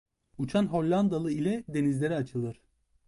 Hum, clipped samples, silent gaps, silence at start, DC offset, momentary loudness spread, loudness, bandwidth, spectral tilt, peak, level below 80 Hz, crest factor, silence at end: none; under 0.1%; none; 0.4 s; under 0.1%; 9 LU; -29 LUFS; 11.5 kHz; -7.5 dB/octave; -16 dBFS; -60 dBFS; 14 dB; 0.55 s